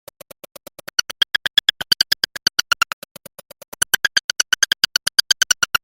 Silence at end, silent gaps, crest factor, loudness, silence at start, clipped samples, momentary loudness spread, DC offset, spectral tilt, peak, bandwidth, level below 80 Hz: 0.05 s; 2.93-3.02 s, 3.11-3.15 s, 3.68-3.72 s, 4.24-4.29 s; 22 dB; -17 LUFS; 1 s; under 0.1%; 7 LU; under 0.1%; 2 dB/octave; 0 dBFS; 17 kHz; -56 dBFS